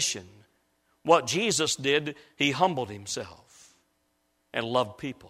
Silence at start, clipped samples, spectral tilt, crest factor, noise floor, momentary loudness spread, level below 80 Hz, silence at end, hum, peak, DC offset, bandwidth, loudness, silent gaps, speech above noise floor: 0 s; under 0.1%; -3 dB/octave; 24 dB; -73 dBFS; 13 LU; -68 dBFS; 0 s; none; -6 dBFS; under 0.1%; 15.5 kHz; -27 LUFS; none; 46 dB